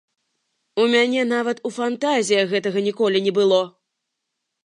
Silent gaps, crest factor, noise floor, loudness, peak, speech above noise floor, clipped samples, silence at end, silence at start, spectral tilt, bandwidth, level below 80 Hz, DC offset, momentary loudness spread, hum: none; 16 dB; -79 dBFS; -20 LUFS; -4 dBFS; 60 dB; under 0.1%; 0.95 s; 0.75 s; -4 dB/octave; 11 kHz; -78 dBFS; under 0.1%; 8 LU; none